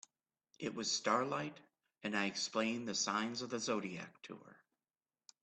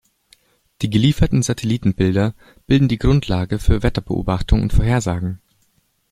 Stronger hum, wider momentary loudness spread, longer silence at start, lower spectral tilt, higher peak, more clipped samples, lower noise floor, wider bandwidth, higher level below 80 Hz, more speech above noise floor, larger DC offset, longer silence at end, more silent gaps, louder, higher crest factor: neither; first, 14 LU vs 7 LU; second, 0.6 s vs 0.8 s; second, -2.5 dB/octave vs -6.5 dB/octave; second, -20 dBFS vs -2 dBFS; neither; first, under -90 dBFS vs -63 dBFS; second, 8.8 kHz vs 15 kHz; second, -82 dBFS vs -26 dBFS; first, over 51 dB vs 46 dB; neither; first, 0.9 s vs 0.75 s; neither; second, -38 LUFS vs -19 LUFS; first, 22 dB vs 16 dB